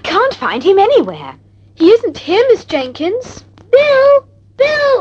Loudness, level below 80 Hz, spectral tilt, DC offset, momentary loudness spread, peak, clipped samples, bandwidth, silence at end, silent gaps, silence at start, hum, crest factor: -12 LUFS; -50 dBFS; -5 dB/octave; under 0.1%; 13 LU; 0 dBFS; 0.1%; 7.8 kHz; 0 s; none; 0.05 s; none; 12 dB